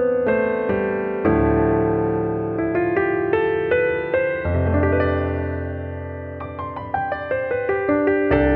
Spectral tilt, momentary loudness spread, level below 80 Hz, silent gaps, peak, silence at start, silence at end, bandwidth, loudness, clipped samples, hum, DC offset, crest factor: -11 dB/octave; 11 LU; -36 dBFS; none; -4 dBFS; 0 s; 0 s; 4.5 kHz; -21 LUFS; under 0.1%; none; under 0.1%; 16 dB